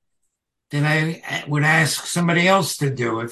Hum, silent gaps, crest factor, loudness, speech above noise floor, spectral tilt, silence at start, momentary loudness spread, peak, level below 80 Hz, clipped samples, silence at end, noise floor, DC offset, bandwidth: none; none; 18 dB; -19 LUFS; 55 dB; -4.5 dB/octave; 0.7 s; 8 LU; -2 dBFS; -62 dBFS; under 0.1%; 0 s; -75 dBFS; under 0.1%; 12.5 kHz